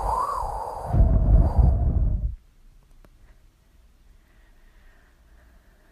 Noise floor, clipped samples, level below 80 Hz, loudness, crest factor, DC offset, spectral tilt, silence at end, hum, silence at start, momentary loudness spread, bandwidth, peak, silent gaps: -56 dBFS; under 0.1%; -26 dBFS; -24 LUFS; 18 dB; under 0.1%; -9 dB/octave; 3.55 s; none; 0 s; 12 LU; 10.5 kHz; -6 dBFS; none